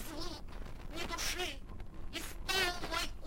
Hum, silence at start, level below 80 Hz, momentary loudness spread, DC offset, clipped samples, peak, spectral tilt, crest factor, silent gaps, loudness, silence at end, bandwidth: none; 0 s; -46 dBFS; 17 LU; under 0.1%; under 0.1%; -18 dBFS; -2 dB/octave; 20 dB; none; -38 LUFS; 0 s; 16.5 kHz